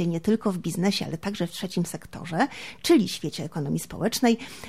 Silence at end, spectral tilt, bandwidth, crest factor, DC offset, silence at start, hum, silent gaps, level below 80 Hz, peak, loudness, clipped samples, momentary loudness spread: 0 s; -5 dB/octave; 16 kHz; 18 dB; 0.3%; 0 s; none; none; -58 dBFS; -8 dBFS; -26 LUFS; under 0.1%; 10 LU